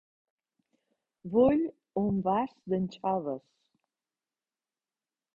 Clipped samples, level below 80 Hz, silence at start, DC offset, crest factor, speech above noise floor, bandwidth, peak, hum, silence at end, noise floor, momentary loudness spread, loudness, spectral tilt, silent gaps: under 0.1%; -64 dBFS; 1.25 s; under 0.1%; 20 dB; over 61 dB; 7 kHz; -14 dBFS; none; 2 s; under -90 dBFS; 12 LU; -30 LUFS; -9.5 dB/octave; none